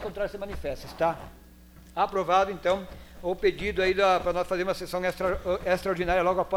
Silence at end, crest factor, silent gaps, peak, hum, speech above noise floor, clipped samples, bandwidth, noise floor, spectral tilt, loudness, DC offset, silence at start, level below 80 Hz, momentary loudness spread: 0 s; 16 dB; none; -10 dBFS; none; 24 dB; under 0.1%; 16.5 kHz; -51 dBFS; -5 dB/octave; -27 LUFS; under 0.1%; 0 s; -46 dBFS; 12 LU